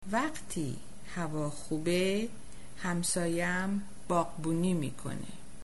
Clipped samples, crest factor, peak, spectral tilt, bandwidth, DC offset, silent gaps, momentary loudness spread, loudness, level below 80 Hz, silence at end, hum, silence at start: under 0.1%; 16 dB; -18 dBFS; -5 dB/octave; 11.5 kHz; 1%; none; 12 LU; -33 LUFS; -56 dBFS; 0 s; none; 0 s